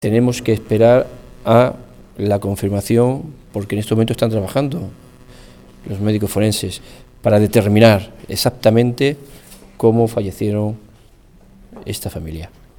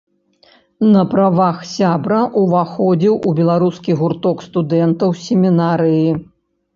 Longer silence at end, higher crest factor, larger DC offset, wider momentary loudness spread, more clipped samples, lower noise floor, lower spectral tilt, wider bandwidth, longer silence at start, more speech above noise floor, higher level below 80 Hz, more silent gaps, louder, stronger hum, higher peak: second, 0.3 s vs 0.55 s; about the same, 18 dB vs 14 dB; neither; first, 16 LU vs 5 LU; neither; second, -46 dBFS vs -52 dBFS; second, -6.5 dB/octave vs -8 dB/octave; first, 19 kHz vs 7.4 kHz; second, 0 s vs 0.8 s; second, 31 dB vs 38 dB; first, -42 dBFS vs -56 dBFS; neither; about the same, -17 LUFS vs -15 LUFS; neither; about the same, 0 dBFS vs 0 dBFS